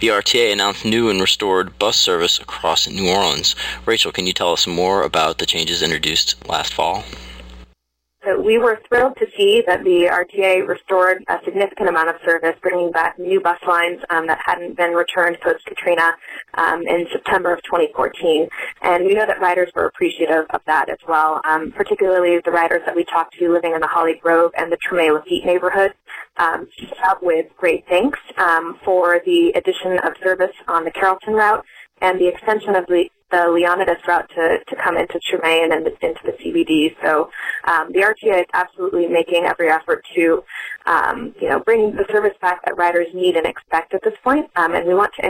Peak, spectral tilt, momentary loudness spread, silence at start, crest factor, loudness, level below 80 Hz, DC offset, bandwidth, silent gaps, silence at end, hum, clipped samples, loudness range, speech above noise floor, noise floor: -2 dBFS; -3 dB/octave; 6 LU; 0 s; 16 dB; -17 LUFS; -50 dBFS; under 0.1%; 16.5 kHz; none; 0 s; none; under 0.1%; 2 LU; 48 dB; -65 dBFS